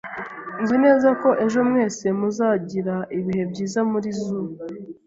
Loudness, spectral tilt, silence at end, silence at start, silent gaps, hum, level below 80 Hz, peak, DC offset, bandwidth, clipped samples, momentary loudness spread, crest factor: -21 LUFS; -6.5 dB/octave; 0.15 s; 0.05 s; none; none; -62 dBFS; -4 dBFS; under 0.1%; 7.8 kHz; under 0.1%; 15 LU; 18 dB